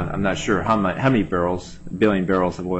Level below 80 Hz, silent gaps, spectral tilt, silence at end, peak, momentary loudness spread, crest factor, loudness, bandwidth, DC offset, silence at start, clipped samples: -40 dBFS; none; -6.5 dB/octave; 0 s; -6 dBFS; 5 LU; 14 dB; -21 LUFS; 8.4 kHz; under 0.1%; 0 s; under 0.1%